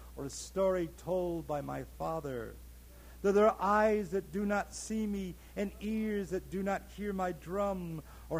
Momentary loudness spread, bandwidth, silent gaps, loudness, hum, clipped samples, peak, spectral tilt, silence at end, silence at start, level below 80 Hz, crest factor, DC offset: 14 LU; 16.5 kHz; none; -34 LUFS; none; under 0.1%; -16 dBFS; -6 dB/octave; 0 s; 0 s; -52 dBFS; 18 dB; under 0.1%